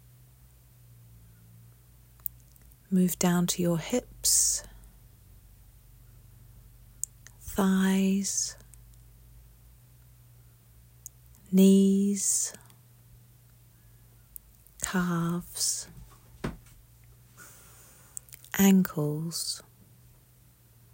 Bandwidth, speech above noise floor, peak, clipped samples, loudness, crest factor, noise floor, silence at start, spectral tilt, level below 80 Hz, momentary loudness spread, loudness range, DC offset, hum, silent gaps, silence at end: 16.5 kHz; 33 dB; -8 dBFS; under 0.1%; -27 LUFS; 22 dB; -59 dBFS; 2.9 s; -4.5 dB/octave; -56 dBFS; 26 LU; 8 LU; under 0.1%; none; none; 1.35 s